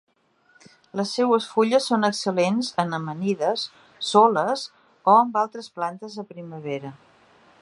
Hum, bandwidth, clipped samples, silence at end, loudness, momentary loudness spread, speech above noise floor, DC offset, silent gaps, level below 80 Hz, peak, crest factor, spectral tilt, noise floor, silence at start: none; 11.5 kHz; under 0.1%; 0.65 s; -22 LUFS; 17 LU; 39 dB; under 0.1%; none; -74 dBFS; -2 dBFS; 22 dB; -5 dB/octave; -61 dBFS; 0.95 s